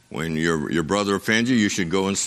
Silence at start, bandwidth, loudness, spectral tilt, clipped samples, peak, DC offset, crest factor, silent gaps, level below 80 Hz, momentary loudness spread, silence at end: 0.1 s; 14.5 kHz; -22 LUFS; -4 dB/octave; under 0.1%; -4 dBFS; under 0.1%; 18 dB; none; -50 dBFS; 4 LU; 0 s